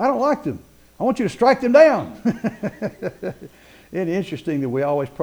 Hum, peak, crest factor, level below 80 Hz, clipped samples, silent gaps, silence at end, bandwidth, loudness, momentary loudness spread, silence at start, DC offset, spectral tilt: none; -2 dBFS; 18 dB; -54 dBFS; under 0.1%; none; 0 s; over 20 kHz; -20 LUFS; 16 LU; 0 s; under 0.1%; -7 dB/octave